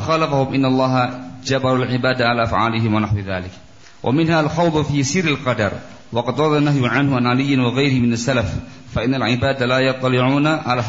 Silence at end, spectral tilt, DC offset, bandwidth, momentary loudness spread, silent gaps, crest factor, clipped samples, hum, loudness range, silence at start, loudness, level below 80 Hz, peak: 0 s; -6 dB/octave; 0.4%; 8 kHz; 7 LU; none; 14 dB; under 0.1%; none; 2 LU; 0 s; -18 LUFS; -42 dBFS; -4 dBFS